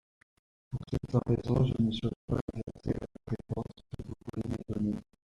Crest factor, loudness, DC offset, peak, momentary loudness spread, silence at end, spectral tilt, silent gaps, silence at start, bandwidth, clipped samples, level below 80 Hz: 20 dB; -34 LUFS; under 0.1%; -14 dBFS; 14 LU; 0.2 s; -8.5 dB/octave; 2.16-2.28 s, 2.41-2.48 s; 0.7 s; 10.5 kHz; under 0.1%; -50 dBFS